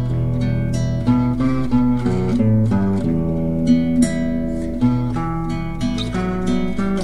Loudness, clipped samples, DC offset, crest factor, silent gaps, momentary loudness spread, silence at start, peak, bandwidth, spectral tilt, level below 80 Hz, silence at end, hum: -19 LUFS; under 0.1%; 3%; 14 dB; none; 6 LU; 0 s; -4 dBFS; 11.5 kHz; -7.5 dB/octave; -32 dBFS; 0 s; none